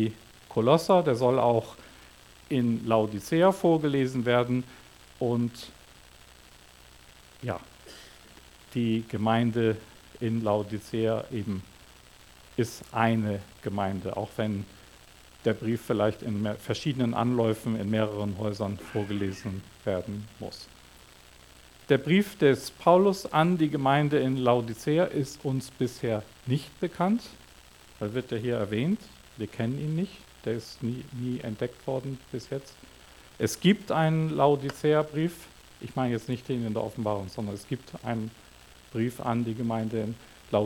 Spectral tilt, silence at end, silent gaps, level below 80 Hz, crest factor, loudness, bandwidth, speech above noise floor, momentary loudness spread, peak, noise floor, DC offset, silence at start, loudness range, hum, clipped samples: -6.5 dB/octave; 0 s; none; -60 dBFS; 22 dB; -28 LUFS; 18 kHz; 26 dB; 14 LU; -6 dBFS; -53 dBFS; under 0.1%; 0 s; 9 LU; none; under 0.1%